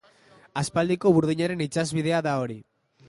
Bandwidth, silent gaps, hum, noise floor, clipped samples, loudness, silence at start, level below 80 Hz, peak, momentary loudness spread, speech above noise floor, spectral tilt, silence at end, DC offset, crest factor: 11.5 kHz; none; none; -56 dBFS; under 0.1%; -25 LUFS; 0.55 s; -60 dBFS; -8 dBFS; 13 LU; 32 dB; -6 dB/octave; 0.45 s; under 0.1%; 18 dB